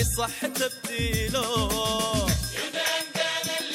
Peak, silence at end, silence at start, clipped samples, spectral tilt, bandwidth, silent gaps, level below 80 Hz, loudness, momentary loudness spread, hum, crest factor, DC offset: -10 dBFS; 0 s; 0 s; under 0.1%; -3 dB/octave; 17 kHz; none; -38 dBFS; -26 LUFS; 3 LU; none; 16 dB; under 0.1%